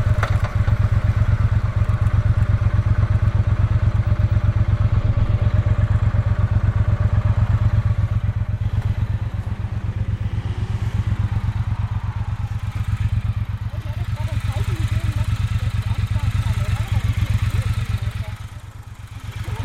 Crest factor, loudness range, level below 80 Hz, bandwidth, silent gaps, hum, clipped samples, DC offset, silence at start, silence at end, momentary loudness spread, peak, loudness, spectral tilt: 14 dB; 5 LU; -26 dBFS; 10.5 kHz; none; none; under 0.1%; under 0.1%; 0 s; 0 s; 8 LU; -4 dBFS; -21 LUFS; -7.5 dB/octave